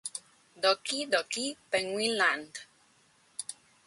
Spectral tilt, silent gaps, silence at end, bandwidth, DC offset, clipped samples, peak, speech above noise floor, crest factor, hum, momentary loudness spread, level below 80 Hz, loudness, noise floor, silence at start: -1 dB/octave; none; 0.35 s; 11.5 kHz; under 0.1%; under 0.1%; -12 dBFS; 35 dB; 20 dB; none; 17 LU; -78 dBFS; -30 LUFS; -65 dBFS; 0.05 s